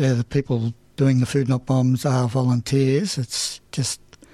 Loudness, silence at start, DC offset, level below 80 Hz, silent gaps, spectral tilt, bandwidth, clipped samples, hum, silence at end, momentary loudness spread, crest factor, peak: -22 LUFS; 0 s; under 0.1%; -50 dBFS; none; -6 dB/octave; 13.5 kHz; under 0.1%; none; 0.4 s; 7 LU; 14 dB; -8 dBFS